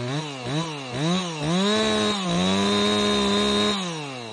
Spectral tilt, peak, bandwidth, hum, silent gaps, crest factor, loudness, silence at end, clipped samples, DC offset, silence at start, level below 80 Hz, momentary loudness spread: -4.5 dB/octave; -10 dBFS; 11.5 kHz; none; none; 14 dB; -23 LUFS; 0 s; under 0.1%; under 0.1%; 0 s; -52 dBFS; 8 LU